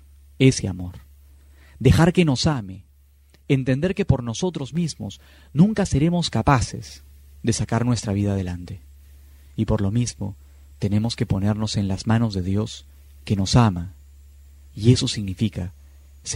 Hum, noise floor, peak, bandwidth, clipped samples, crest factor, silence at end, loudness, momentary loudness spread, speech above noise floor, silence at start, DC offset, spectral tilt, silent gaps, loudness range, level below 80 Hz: none; -53 dBFS; -2 dBFS; 13 kHz; under 0.1%; 20 dB; 0 s; -22 LUFS; 18 LU; 32 dB; 0.4 s; under 0.1%; -6 dB/octave; none; 4 LU; -40 dBFS